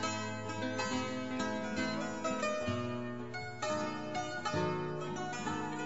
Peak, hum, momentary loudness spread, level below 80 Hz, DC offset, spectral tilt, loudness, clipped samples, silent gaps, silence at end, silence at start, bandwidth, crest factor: -22 dBFS; none; 4 LU; -68 dBFS; 0.3%; -4.5 dB/octave; -37 LUFS; under 0.1%; none; 0 s; 0 s; 8 kHz; 16 dB